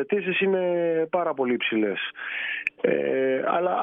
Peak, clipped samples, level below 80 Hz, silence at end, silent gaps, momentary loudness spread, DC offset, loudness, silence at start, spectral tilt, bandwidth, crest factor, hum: -6 dBFS; under 0.1%; -76 dBFS; 0 s; none; 5 LU; under 0.1%; -25 LUFS; 0 s; -7.5 dB/octave; 3.8 kHz; 18 dB; none